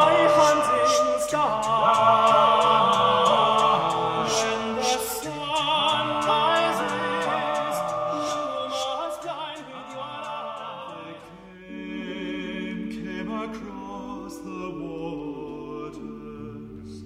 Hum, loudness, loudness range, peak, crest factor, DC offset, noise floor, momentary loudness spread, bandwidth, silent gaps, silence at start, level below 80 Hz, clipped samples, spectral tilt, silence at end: none; -23 LUFS; 15 LU; -6 dBFS; 18 dB; under 0.1%; -44 dBFS; 19 LU; 16 kHz; none; 0 s; -56 dBFS; under 0.1%; -3.5 dB/octave; 0 s